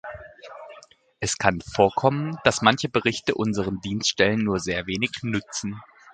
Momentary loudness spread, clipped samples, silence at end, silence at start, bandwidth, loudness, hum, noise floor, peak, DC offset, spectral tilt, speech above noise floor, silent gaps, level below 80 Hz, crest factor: 20 LU; under 0.1%; 0.05 s; 0.05 s; 9.4 kHz; -23 LUFS; none; -50 dBFS; 0 dBFS; under 0.1%; -4 dB/octave; 26 dB; none; -50 dBFS; 24 dB